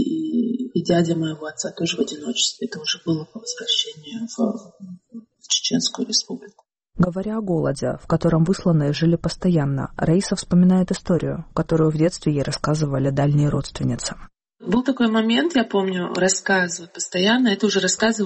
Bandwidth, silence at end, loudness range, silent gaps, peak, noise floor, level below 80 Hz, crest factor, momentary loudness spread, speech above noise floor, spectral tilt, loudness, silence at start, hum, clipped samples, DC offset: 8.8 kHz; 0 s; 4 LU; none; -6 dBFS; -42 dBFS; -46 dBFS; 14 dB; 10 LU; 22 dB; -5 dB/octave; -21 LUFS; 0 s; none; under 0.1%; under 0.1%